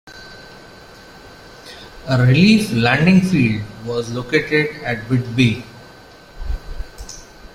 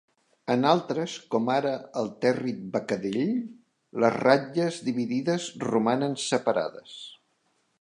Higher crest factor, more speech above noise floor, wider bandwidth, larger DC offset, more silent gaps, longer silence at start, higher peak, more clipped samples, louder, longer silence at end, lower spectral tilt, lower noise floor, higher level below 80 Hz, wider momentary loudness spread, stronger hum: about the same, 18 dB vs 22 dB; second, 27 dB vs 45 dB; first, 14.5 kHz vs 11 kHz; neither; neither; second, 0.05 s vs 0.45 s; first, 0 dBFS vs -4 dBFS; neither; first, -16 LUFS vs -27 LUFS; second, 0.3 s vs 0.65 s; about the same, -6.5 dB/octave vs -5.5 dB/octave; second, -42 dBFS vs -71 dBFS; first, -36 dBFS vs -74 dBFS; first, 25 LU vs 13 LU; neither